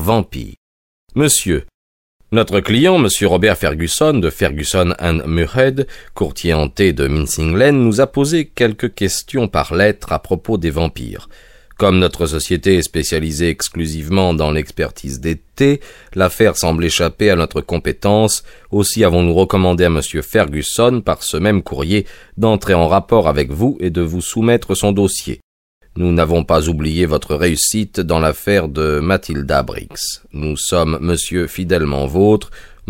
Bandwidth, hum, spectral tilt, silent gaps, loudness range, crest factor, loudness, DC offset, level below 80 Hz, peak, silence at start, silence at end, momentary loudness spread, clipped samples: 16.5 kHz; none; -5 dB/octave; 0.57-1.07 s, 1.74-2.20 s, 25.43-25.81 s; 3 LU; 16 dB; -15 LUFS; under 0.1%; -30 dBFS; 0 dBFS; 0 s; 0.25 s; 9 LU; under 0.1%